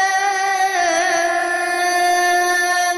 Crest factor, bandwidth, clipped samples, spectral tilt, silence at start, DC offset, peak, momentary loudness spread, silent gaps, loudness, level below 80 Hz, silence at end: 10 dB; 13 kHz; under 0.1%; 0.5 dB/octave; 0 s; under 0.1%; -8 dBFS; 3 LU; none; -16 LUFS; -62 dBFS; 0 s